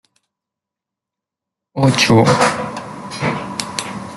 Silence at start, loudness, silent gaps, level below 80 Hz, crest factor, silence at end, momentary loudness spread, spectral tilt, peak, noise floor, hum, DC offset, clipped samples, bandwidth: 1.75 s; -16 LUFS; none; -52 dBFS; 18 dB; 0 s; 17 LU; -5 dB/octave; -2 dBFS; -85 dBFS; none; under 0.1%; under 0.1%; 12.5 kHz